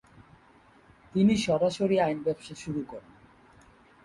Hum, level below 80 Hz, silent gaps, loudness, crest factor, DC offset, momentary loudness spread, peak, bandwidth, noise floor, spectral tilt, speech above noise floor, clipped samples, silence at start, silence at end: none; -60 dBFS; none; -27 LUFS; 16 dB; under 0.1%; 13 LU; -14 dBFS; 11.5 kHz; -58 dBFS; -6 dB/octave; 32 dB; under 0.1%; 1.15 s; 1.05 s